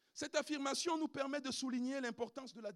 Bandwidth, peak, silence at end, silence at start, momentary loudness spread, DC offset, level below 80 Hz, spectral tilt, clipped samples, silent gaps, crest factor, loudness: 13 kHz; -22 dBFS; 0 s; 0.15 s; 7 LU; under 0.1%; -86 dBFS; -2.5 dB/octave; under 0.1%; none; 20 dB; -40 LUFS